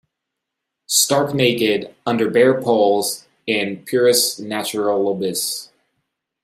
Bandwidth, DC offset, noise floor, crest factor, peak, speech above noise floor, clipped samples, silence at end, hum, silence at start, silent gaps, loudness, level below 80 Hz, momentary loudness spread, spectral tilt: 16 kHz; under 0.1%; -80 dBFS; 16 dB; -2 dBFS; 63 dB; under 0.1%; 0.8 s; none; 0.9 s; none; -18 LUFS; -66 dBFS; 9 LU; -3 dB/octave